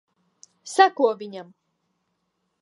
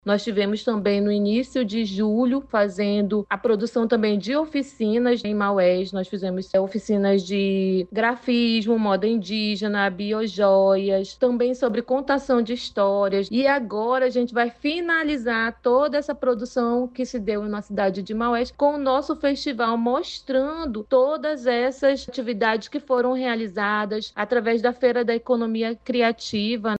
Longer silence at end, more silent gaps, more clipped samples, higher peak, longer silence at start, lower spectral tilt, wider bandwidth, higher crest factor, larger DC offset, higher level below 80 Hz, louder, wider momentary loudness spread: first, 1.2 s vs 0 s; neither; neither; first, -2 dBFS vs -8 dBFS; first, 0.65 s vs 0.05 s; second, -3 dB/octave vs -6 dB/octave; first, 11.5 kHz vs 8.4 kHz; first, 24 dB vs 14 dB; neither; second, -88 dBFS vs -56 dBFS; about the same, -20 LUFS vs -22 LUFS; first, 20 LU vs 5 LU